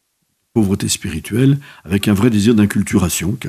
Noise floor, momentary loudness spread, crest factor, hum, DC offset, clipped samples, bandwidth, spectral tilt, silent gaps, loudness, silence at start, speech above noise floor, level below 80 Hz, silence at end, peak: -67 dBFS; 8 LU; 16 dB; none; under 0.1%; under 0.1%; 15.5 kHz; -5.5 dB/octave; none; -16 LUFS; 0.55 s; 52 dB; -44 dBFS; 0 s; 0 dBFS